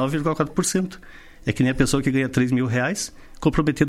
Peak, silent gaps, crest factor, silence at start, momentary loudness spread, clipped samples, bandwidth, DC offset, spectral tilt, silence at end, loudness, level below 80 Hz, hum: -4 dBFS; none; 18 dB; 0 s; 10 LU; under 0.1%; 15.5 kHz; under 0.1%; -5.5 dB/octave; 0 s; -22 LUFS; -40 dBFS; none